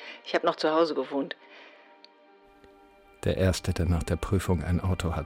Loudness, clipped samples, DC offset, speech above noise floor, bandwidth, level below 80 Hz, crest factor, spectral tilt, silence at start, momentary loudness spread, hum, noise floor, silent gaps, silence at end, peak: -28 LUFS; under 0.1%; under 0.1%; 30 dB; 16 kHz; -42 dBFS; 16 dB; -6 dB/octave; 0 s; 10 LU; none; -57 dBFS; none; 0 s; -12 dBFS